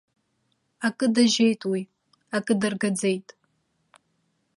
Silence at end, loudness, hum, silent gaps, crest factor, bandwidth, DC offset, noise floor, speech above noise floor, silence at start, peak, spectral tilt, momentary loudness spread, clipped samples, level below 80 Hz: 1.35 s; -24 LUFS; none; none; 20 dB; 11.5 kHz; under 0.1%; -72 dBFS; 49 dB; 0.8 s; -8 dBFS; -4 dB/octave; 11 LU; under 0.1%; -72 dBFS